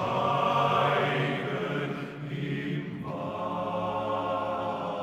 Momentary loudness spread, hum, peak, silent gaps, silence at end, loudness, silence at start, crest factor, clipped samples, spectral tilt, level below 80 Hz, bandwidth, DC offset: 10 LU; none; -12 dBFS; none; 0 s; -29 LUFS; 0 s; 16 dB; under 0.1%; -6.5 dB/octave; -64 dBFS; 13 kHz; under 0.1%